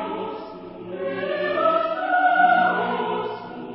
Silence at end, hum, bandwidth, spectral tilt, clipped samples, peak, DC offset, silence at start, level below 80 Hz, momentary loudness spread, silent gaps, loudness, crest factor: 0 s; none; 5.6 kHz; -9.5 dB/octave; under 0.1%; -6 dBFS; under 0.1%; 0 s; -66 dBFS; 18 LU; none; -22 LUFS; 16 dB